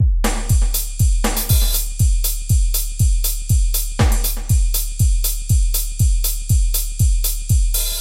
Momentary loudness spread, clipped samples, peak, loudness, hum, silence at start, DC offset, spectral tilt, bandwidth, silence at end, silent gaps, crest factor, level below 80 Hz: 4 LU; under 0.1%; -2 dBFS; -19 LUFS; none; 0 s; 0.2%; -4 dB/octave; 17 kHz; 0 s; none; 14 dB; -18 dBFS